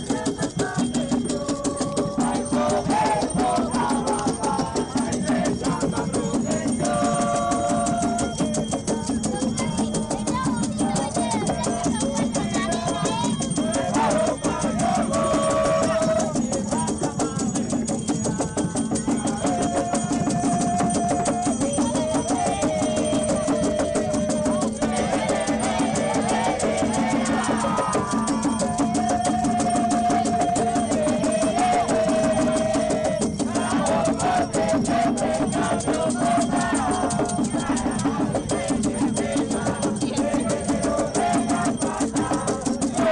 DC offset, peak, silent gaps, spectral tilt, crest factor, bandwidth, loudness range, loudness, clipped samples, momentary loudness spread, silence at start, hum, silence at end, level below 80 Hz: under 0.1%; -12 dBFS; none; -5 dB/octave; 10 dB; 11 kHz; 2 LU; -23 LUFS; under 0.1%; 4 LU; 0 s; none; 0 s; -44 dBFS